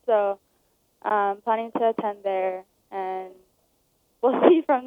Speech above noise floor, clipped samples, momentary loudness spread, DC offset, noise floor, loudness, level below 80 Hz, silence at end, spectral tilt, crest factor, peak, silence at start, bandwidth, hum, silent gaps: 45 dB; under 0.1%; 18 LU; under 0.1%; -68 dBFS; -24 LUFS; -78 dBFS; 0 s; -7.5 dB/octave; 22 dB; -4 dBFS; 0.05 s; 3.9 kHz; none; none